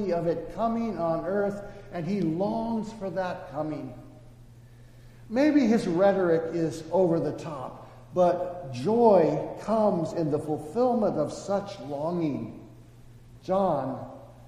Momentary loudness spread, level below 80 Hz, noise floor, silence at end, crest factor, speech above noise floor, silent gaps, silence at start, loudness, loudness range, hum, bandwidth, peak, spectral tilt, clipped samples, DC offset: 15 LU; -54 dBFS; -50 dBFS; 0 s; 18 dB; 24 dB; none; 0 s; -27 LUFS; 6 LU; none; 13 kHz; -8 dBFS; -7.5 dB/octave; under 0.1%; under 0.1%